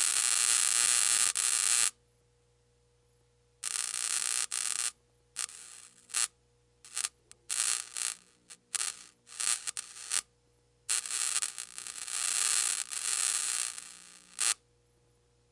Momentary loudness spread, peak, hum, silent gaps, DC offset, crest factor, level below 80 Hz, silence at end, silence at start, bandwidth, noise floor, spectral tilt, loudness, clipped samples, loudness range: 16 LU; -6 dBFS; 60 Hz at -75 dBFS; none; under 0.1%; 28 dB; -76 dBFS; 1 s; 0 s; 11.5 kHz; -69 dBFS; 4 dB/octave; -29 LUFS; under 0.1%; 6 LU